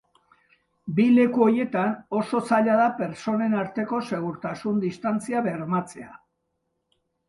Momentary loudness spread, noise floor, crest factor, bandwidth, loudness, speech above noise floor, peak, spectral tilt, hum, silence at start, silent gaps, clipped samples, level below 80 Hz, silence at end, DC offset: 11 LU; -76 dBFS; 18 dB; 11.5 kHz; -24 LUFS; 53 dB; -6 dBFS; -7 dB/octave; none; 0.85 s; none; under 0.1%; -68 dBFS; 1.15 s; under 0.1%